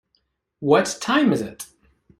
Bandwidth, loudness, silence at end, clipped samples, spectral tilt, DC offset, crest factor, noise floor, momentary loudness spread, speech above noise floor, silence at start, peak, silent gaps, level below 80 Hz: 15.5 kHz; -20 LUFS; 0.55 s; under 0.1%; -4.5 dB/octave; under 0.1%; 20 dB; -70 dBFS; 18 LU; 50 dB; 0.6 s; -2 dBFS; none; -60 dBFS